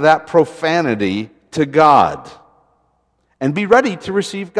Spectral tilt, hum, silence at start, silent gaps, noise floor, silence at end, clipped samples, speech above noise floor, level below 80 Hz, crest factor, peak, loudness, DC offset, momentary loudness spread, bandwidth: -5.5 dB/octave; none; 0 s; none; -63 dBFS; 0 s; under 0.1%; 48 dB; -54 dBFS; 16 dB; 0 dBFS; -15 LUFS; under 0.1%; 12 LU; 11 kHz